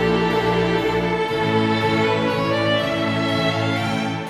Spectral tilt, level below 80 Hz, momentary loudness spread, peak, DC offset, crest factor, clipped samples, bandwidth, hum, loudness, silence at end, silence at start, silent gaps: -6 dB/octave; -44 dBFS; 3 LU; -8 dBFS; under 0.1%; 12 dB; under 0.1%; 14 kHz; none; -20 LUFS; 0 s; 0 s; none